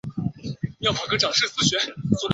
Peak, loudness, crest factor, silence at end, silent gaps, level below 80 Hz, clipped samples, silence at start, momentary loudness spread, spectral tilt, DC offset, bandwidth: -4 dBFS; -23 LUFS; 20 dB; 0 s; none; -50 dBFS; under 0.1%; 0.05 s; 11 LU; -3.5 dB/octave; under 0.1%; 8.2 kHz